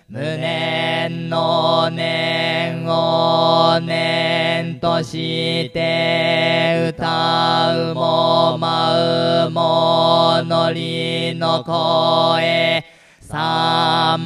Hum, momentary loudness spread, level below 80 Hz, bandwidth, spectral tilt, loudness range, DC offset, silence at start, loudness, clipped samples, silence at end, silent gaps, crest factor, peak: none; 6 LU; -56 dBFS; 12 kHz; -5.5 dB/octave; 2 LU; under 0.1%; 0.1 s; -17 LUFS; under 0.1%; 0 s; none; 16 dB; -2 dBFS